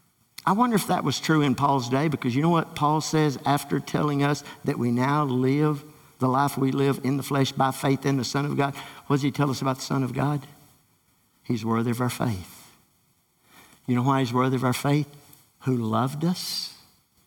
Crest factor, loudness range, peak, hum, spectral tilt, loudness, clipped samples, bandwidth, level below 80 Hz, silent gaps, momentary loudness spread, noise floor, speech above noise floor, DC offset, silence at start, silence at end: 16 dB; 5 LU; -8 dBFS; none; -6 dB/octave; -25 LUFS; under 0.1%; 18.5 kHz; -62 dBFS; none; 7 LU; -66 dBFS; 42 dB; under 0.1%; 0.45 s; 0.5 s